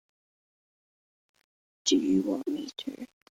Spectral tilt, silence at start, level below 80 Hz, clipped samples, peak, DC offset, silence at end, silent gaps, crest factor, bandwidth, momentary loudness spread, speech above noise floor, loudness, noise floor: -4 dB/octave; 1.85 s; -72 dBFS; under 0.1%; -12 dBFS; under 0.1%; 0.35 s; none; 20 dB; 11 kHz; 15 LU; over 61 dB; -29 LUFS; under -90 dBFS